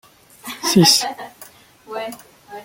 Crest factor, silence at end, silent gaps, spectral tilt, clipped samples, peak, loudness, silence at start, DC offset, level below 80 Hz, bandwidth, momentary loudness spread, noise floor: 20 dB; 0 s; none; -3.5 dB/octave; under 0.1%; -2 dBFS; -15 LUFS; 0.45 s; under 0.1%; -56 dBFS; 17 kHz; 25 LU; -45 dBFS